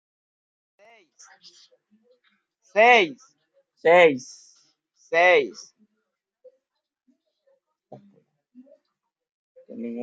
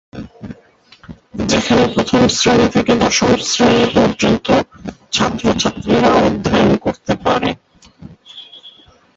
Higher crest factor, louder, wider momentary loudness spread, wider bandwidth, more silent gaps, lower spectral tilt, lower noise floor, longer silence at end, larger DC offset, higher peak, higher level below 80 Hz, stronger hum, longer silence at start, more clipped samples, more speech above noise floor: first, 24 dB vs 16 dB; second, -19 LUFS vs -14 LUFS; first, 24 LU vs 20 LU; about the same, 7.8 kHz vs 8 kHz; first, 9.32-9.55 s vs none; about the same, -3.5 dB/octave vs -4.5 dB/octave; first, -82 dBFS vs -47 dBFS; second, 0 s vs 0.45 s; neither; about the same, -2 dBFS vs 0 dBFS; second, -84 dBFS vs -38 dBFS; neither; first, 2.75 s vs 0.15 s; neither; first, 62 dB vs 34 dB